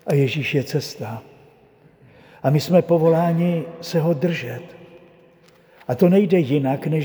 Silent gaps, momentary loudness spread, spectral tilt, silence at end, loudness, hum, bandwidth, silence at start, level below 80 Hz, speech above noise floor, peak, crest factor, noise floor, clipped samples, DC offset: none; 16 LU; -7.5 dB/octave; 0 s; -20 LUFS; none; over 20 kHz; 0.05 s; -64 dBFS; 34 dB; -4 dBFS; 18 dB; -52 dBFS; under 0.1%; under 0.1%